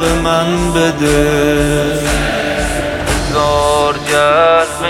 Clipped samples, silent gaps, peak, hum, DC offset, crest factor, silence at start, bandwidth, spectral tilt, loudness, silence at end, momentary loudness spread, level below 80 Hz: under 0.1%; none; 0 dBFS; none; under 0.1%; 12 dB; 0 s; 16.5 kHz; -4.5 dB/octave; -13 LUFS; 0 s; 6 LU; -24 dBFS